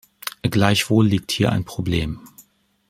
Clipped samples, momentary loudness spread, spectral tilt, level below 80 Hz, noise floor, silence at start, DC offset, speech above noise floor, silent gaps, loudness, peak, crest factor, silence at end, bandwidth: under 0.1%; 13 LU; -5.5 dB/octave; -44 dBFS; -54 dBFS; 0.25 s; under 0.1%; 35 dB; none; -20 LUFS; -2 dBFS; 20 dB; 0.5 s; 16 kHz